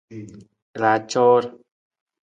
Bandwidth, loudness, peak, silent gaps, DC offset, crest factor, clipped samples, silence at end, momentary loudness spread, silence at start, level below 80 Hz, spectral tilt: 8.8 kHz; -19 LUFS; -4 dBFS; 0.62-0.74 s; under 0.1%; 18 dB; under 0.1%; 0.75 s; 22 LU; 0.1 s; -68 dBFS; -5 dB/octave